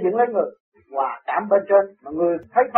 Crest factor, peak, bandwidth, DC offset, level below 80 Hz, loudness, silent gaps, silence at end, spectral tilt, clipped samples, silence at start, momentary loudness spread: 18 dB; -2 dBFS; 4 kHz; under 0.1%; -66 dBFS; -21 LUFS; 0.60-0.72 s; 0 s; -5.5 dB/octave; under 0.1%; 0 s; 11 LU